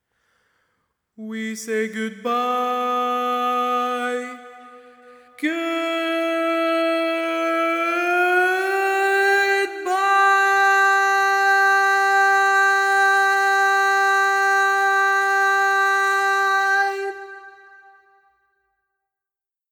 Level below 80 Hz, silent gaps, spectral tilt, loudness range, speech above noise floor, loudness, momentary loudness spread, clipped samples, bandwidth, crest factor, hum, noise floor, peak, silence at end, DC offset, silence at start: -70 dBFS; none; -1.5 dB/octave; 8 LU; 65 dB; -18 LUFS; 10 LU; under 0.1%; over 20 kHz; 14 dB; none; -89 dBFS; -6 dBFS; 2.2 s; under 0.1%; 1.2 s